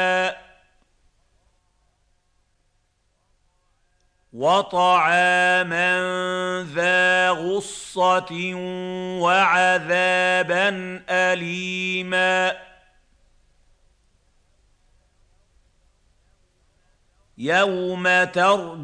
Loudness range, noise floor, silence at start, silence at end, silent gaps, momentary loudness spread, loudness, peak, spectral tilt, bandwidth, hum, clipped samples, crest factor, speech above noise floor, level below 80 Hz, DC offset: 9 LU; -68 dBFS; 0 s; 0 s; none; 11 LU; -20 LUFS; -6 dBFS; -3.5 dB/octave; 10.5 kHz; none; under 0.1%; 18 dB; 47 dB; -62 dBFS; under 0.1%